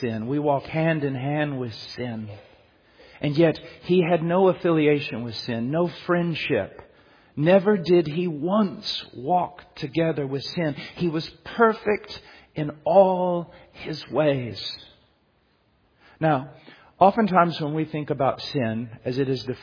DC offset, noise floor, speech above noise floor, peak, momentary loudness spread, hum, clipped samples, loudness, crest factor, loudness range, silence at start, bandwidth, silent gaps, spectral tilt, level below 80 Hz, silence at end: under 0.1%; -64 dBFS; 41 dB; -4 dBFS; 13 LU; none; under 0.1%; -24 LUFS; 20 dB; 4 LU; 0 s; 5.2 kHz; none; -8 dB/octave; -60 dBFS; 0 s